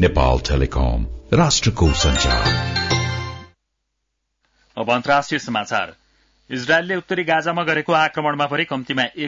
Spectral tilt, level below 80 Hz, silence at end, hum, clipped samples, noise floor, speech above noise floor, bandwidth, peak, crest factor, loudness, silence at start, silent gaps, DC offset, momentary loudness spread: -4.5 dB/octave; -28 dBFS; 0 s; none; under 0.1%; -75 dBFS; 56 dB; 7.8 kHz; -4 dBFS; 16 dB; -19 LUFS; 0 s; none; under 0.1%; 11 LU